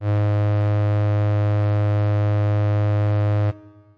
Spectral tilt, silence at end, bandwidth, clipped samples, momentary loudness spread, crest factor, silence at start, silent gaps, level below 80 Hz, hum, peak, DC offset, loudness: -10 dB/octave; 0.4 s; 4.7 kHz; under 0.1%; 1 LU; 4 dB; 0 s; none; -60 dBFS; none; -16 dBFS; 0.1%; -20 LUFS